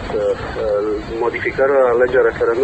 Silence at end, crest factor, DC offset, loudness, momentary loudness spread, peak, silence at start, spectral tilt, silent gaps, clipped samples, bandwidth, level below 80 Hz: 0 s; 14 dB; 0.2%; -17 LUFS; 7 LU; -2 dBFS; 0 s; -6.5 dB/octave; none; under 0.1%; 8.6 kHz; -38 dBFS